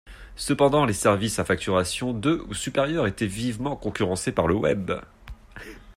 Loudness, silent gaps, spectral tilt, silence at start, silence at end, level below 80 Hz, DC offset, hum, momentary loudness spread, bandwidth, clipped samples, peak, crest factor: -24 LUFS; none; -5 dB/octave; 0.05 s; 0.05 s; -46 dBFS; under 0.1%; none; 13 LU; 16 kHz; under 0.1%; -6 dBFS; 18 dB